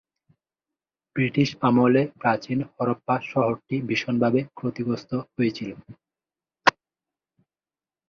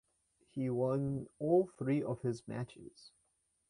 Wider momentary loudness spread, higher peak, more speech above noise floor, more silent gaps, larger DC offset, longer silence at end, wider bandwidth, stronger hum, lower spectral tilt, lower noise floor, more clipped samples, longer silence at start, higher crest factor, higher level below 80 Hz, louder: second, 10 LU vs 15 LU; first, -2 dBFS vs -20 dBFS; first, over 66 dB vs 44 dB; neither; neither; first, 1.4 s vs 0.6 s; second, 7.2 kHz vs 11 kHz; neither; second, -6.5 dB/octave vs -8.5 dB/octave; first, under -90 dBFS vs -79 dBFS; neither; first, 1.15 s vs 0.55 s; first, 24 dB vs 18 dB; first, -64 dBFS vs -70 dBFS; first, -24 LUFS vs -36 LUFS